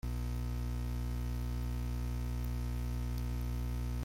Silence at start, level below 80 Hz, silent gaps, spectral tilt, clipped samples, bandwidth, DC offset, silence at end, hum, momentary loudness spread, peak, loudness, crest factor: 0.05 s; -38 dBFS; none; -6.5 dB/octave; under 0.1%; 16 kHz; under 0.1%; 0 s; 60 Hz at -35 dBFS; 0 LU; -28 dBFS; -39 LUFS; 8 dB